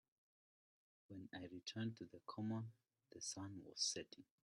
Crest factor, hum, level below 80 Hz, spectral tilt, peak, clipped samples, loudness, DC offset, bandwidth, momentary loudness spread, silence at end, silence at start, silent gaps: 22 dB; none; -88 dBFS; -3.5 dB/octave; -28 dBFS; under 0.1%; -48 LUFS; under 0.1%; 13 kHz; 16 LU; 0.2 s; 1.1 s; none